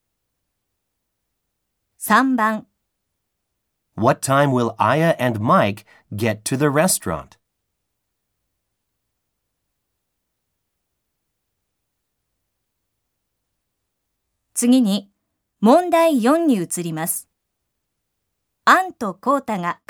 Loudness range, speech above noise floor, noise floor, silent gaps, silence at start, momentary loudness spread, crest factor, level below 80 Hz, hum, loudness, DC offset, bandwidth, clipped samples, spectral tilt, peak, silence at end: 6 LU; 59 dB; -77 dBFS; none; 2 s; 11 LU; 20 dB; -62 dBFS; none; -18 LUFS; under 0.1%; over 20 kHz; under 0.1%; -5 dB/octave; -2 dBFS; 0.15 s